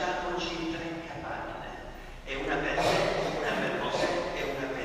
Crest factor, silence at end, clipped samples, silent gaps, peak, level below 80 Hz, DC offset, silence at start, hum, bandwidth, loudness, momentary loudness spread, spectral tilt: 18 dB; 0 s; under 0.1%; none; -14 dBFS; -48 dBFS; under 0.1%; 0 s; none; 15.5 kHz; -31 LUFS; 13 LU; -4.5 dB/octave